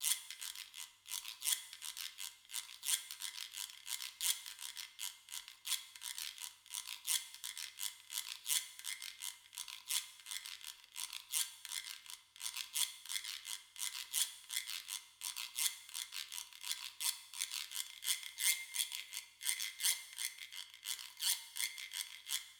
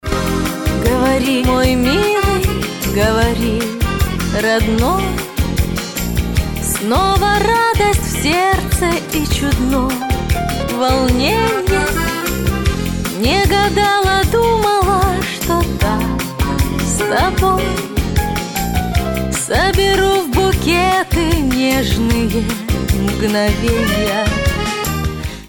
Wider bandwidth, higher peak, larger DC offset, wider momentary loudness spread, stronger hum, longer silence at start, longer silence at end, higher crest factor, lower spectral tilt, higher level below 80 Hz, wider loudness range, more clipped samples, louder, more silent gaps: first, over 20 kHz vs 17.5 kHz; second, -14 dBFS vs -2 dBFS; neither; first, 10 LU vs 6 LU; neither; about the same, 0 s vs 0.05 s; about the same, 0 s vs 0 s; first, 30 dB vs 14 dB; second, 5.5 dB/octave vs -5 dB/octave; second, -88 dBFS vs -22 dBFS; about the same, 4 LU vs 2 LU; neither; second, -40 LUFS vs -15 LUFS; neither